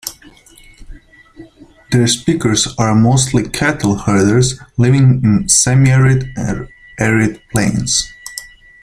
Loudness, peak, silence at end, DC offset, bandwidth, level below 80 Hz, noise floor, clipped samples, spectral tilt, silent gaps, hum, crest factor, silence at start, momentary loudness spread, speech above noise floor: -13 LUFS; 0 dBFS; 0.35 s; under 0.1%; 15.5 kHz; -36 dBFS; -43 dBFS; under 0.1%; -4.5 dB/octave; none; none; 14 dB; 0.05 s; 12 LU; 30 dB